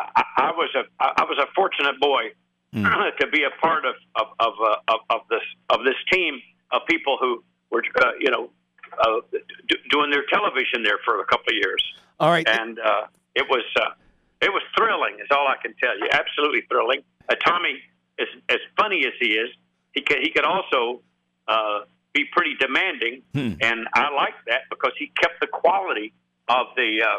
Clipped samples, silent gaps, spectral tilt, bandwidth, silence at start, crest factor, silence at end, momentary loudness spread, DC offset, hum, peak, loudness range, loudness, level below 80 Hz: under 0.1%; none; -4.5 dB/octave; 13 kHz; 0 s; 18 dB; 0 s; 8 LU; under 0.1%; none; -6 dBFS; 2 LU; -22 LUFS; -62 dBFS